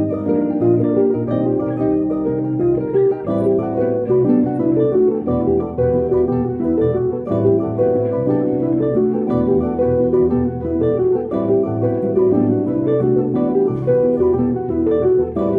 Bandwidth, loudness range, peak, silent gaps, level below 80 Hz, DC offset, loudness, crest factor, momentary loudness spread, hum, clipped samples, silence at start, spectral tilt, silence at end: 3.7 kHz; 1 LU; -4 dBFS; none; -42 dBFS; under 0.1%; -17 LUFS; 12 dB; 4 LU; none; under 0.1%; 0 s; -12 dB/octave; 0 s